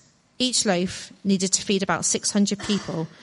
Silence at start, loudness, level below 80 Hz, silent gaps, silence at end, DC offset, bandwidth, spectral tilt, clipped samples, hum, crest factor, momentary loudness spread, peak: 0.4 s; -23 LUFS; -58 dBFS; none; 0 s; under 0.1%; 11.5 kHz; -3.5 dB/octave; under 0.1%; none; 20 dB; 6 LU; -4 dBFS